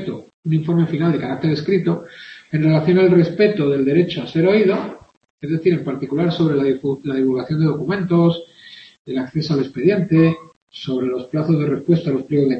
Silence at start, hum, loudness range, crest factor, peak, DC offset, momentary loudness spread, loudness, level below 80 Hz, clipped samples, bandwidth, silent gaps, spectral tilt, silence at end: 0 s; none; 3 LU; 16 dB; -2 dBFS; under 0.1%; 12 LU; -18 LUFS; -56 dBFS; under 0.1%; 6.2 kHz; 0.34-0.43 s, 5.17-5.21 s, 5.30-5.38 s, 8.99-9.05 s, 10.56-10.67 s; -9 dB/octave; 0 s